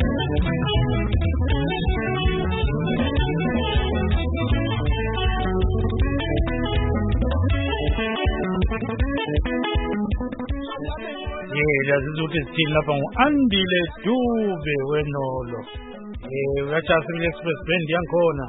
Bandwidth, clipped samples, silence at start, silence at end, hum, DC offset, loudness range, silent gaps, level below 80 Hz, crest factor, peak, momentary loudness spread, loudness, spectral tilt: 4 kHz; under 0.1%; 0 s; 0 s; none; under 0.1%; 3 LU; none; -28 dBFS; 20 dB; -2 dBFS; 8 LU; -23 LUFS; -11.5 dB/octave